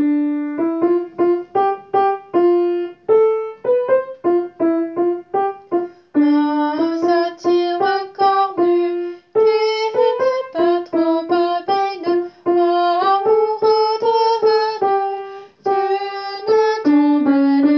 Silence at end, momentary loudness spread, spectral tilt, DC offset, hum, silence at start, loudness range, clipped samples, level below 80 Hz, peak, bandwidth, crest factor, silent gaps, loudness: 0 s; 6 LU; -5.5 dB/octave; under 0.1%; none; 0 s; 2 LU; under 0.1%; -70 dBFS; -4 dBFS; 6.2 kHz; 12 dB; none; -17 LUFS